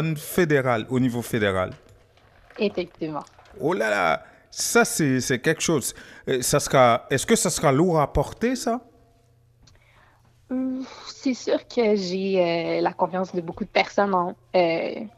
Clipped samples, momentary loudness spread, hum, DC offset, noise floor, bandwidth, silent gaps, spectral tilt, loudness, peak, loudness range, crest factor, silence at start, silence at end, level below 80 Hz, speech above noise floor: under 0.1%; 11 LU; none; under 0.1%; -59 dBFS; 15.5 kHz; none; -4.5 dB/octave; -23 LUFS; -4 dBFS; 7 LU; 20 dB; 0 s; 0.1 s; -48 dBFS; 36 dB